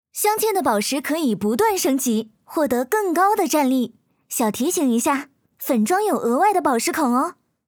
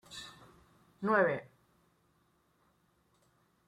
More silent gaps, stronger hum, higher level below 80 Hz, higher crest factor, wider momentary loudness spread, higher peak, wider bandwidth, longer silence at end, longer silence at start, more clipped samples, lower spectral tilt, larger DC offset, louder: neither; neither; first, -64 dBFS vs -76 dBFS; second, 14 dB vs 24 dB; second, 6 LU vs 19 LU; first, -6 dBFS vs -16 dBFS; first, over 20 kHz vs 14.5 kHz; second, 0.35 s vs 2.25 s; about the same, 0.15 s vs 0.1 s; neither; second, -3.5 dB/octave vs -5.5 dB/octave; neither; first, -20 LUFS vs -32 LUFS